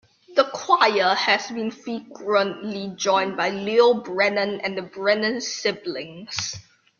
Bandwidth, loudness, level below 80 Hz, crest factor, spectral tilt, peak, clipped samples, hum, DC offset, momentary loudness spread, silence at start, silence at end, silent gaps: 7.4 kHz; -22 LUFS; -68 dBFS; 20 dB; -3 dB/octave; -2 dBFS; under 0.1%; none; under 0.1%; 13 LU; 0.3 s; 0.4 s; none